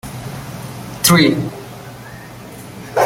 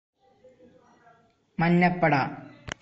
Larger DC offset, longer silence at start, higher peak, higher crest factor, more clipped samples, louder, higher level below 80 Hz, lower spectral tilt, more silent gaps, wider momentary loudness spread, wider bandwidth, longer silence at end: neither; second, 0.05 s vs 1.6 s; first, 0 dBFS vs -10 dBFS; about the same, 20 dB vs 18 dB; neither; first, -14 LUFS vs -24 LUFS; first, -46 dBFS vs -56 dBFS; second, -4 dB/octave vs -7.5 dB/octave; neither; first, 23 LU vs 18 LU; first, 17 kHz vs 7.6 kHz; about the same, 0 s vs 0.1 s